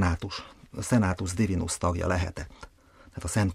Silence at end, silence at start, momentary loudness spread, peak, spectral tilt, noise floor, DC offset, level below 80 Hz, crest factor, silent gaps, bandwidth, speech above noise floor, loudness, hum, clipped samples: 0 s; 0 s; 16 LU; -10 dBFS; -5.5 dB/octave; -55 dBFS; under 0.1%; -42 dBFS; 18 dB; none; 15 kHz; 27 dB; -29 LUFS; none; under 0.1%